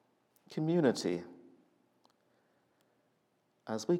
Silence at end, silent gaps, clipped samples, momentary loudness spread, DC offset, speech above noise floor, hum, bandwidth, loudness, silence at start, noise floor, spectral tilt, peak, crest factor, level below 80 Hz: 0 s; none; under 0.1%; 20 LU; under 0.1%; 44 dB; none; 13.5 kHz; -34 LUFS; 0.5 s; -76 dBFS; -6 dB/octave; -16 dBFS; 20 dB; under -90 dBFS